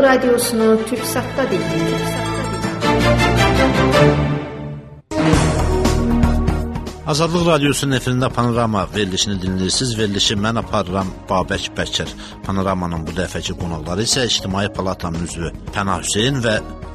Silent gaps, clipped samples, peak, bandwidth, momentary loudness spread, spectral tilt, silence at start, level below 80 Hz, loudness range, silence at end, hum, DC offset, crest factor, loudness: none; under 0.1%; 0 dBFS; 13.5 kHz; 10 LU; -4.5 dB/octave; 0 s; -30 dBFS; 4 LU; 0 s; none; under 0.1%; 18 dB; -18 LUFS